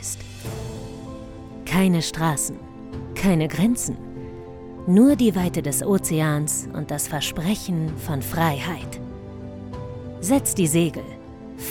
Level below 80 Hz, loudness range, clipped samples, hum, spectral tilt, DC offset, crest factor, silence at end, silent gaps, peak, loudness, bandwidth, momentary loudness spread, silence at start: -44 dBFS; 5 LU; under 0.1%; none; -5 dB/octave; under 0.1%; 18 dB; 0 s; none; -6 dBFS; -22 LUFS; 18.5 kHz; 17 LU; 0 s